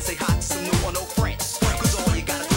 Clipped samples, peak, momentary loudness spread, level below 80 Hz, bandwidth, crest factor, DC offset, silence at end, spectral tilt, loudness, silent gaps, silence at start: under 0.1%; -6 dBFS; 4 LU; -30 dBFS; 17 kHz; 16 dB; under 0.1%; 0 s; -4 dB/octave; -23 LUFS; none; 0 s